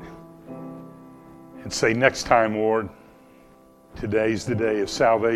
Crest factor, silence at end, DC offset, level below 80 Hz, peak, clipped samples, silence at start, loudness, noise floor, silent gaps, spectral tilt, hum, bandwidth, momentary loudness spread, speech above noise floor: 24 dB; 0 s; under 0.1%; -50 dBFS; 0 dBFS; under 0.1%; 0 s; -22 LUFS; -52 dBFS; none; -4.5 dB/octave; none; 14 kHz; 22 LU; 31 dB